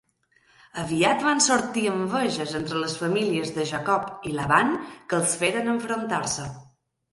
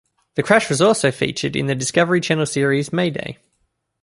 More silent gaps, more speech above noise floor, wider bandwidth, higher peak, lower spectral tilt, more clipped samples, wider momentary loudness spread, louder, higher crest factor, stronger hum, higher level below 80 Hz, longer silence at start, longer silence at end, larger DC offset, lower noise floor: neither; second, 39 dB vs 51 dB; about the same, 11.5 kHz vs 11.5 kHz; about the same, -4 dBFS vs -2 dBFS; about the same, -3.5 dB/octave vs -4.5 dB/octave; neither; about the same, 9 LU vs 9 LU; second, -24 LUFS vs -18 LUFS; about the same, 20 dB vs 18 dB; neither; about the same, -60 dBFS vs -56 dBFS; first, 0.75 s vs 0.35 s; second, 0.5 s vs 0.7 s; neither; second, -64 dBFS vs -69 dBFS